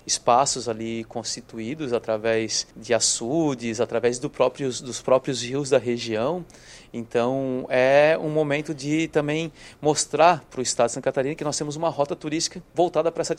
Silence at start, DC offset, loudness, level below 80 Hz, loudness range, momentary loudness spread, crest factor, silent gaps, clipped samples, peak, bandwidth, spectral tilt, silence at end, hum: 0.05 s; under 0.1%; -23 LUFS; -58 dBFS; 3 LU; 11 LU; 20 dB; none; under 0.1%; -4 dBFS; 13.5 kHz; -3.5 dB/octave; 0 s; none